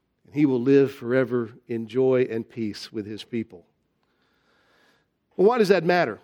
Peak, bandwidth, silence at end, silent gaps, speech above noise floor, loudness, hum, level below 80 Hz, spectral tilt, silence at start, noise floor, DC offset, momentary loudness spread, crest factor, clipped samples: -4 dBFS; 16 kHz; 0.05 s; none; 48 dB; -23 LUFS; none; -72 dBFS; -7 dB/octave; 0.35 s; -70 dBFS; under 0.1%; 14 LU; 20 dB; under 0.1%